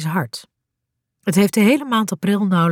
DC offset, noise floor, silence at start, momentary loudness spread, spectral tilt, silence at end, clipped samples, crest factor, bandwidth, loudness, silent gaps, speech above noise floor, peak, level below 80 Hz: under 0.1%; -78 dBFS; 0 s; 13 LU; -5.5 dB/octave; 0 s; under 0.1%; 16 dB; 17 kHz; -18 LUFS; none; 61 dB; -4 dBFS; -64 dBFS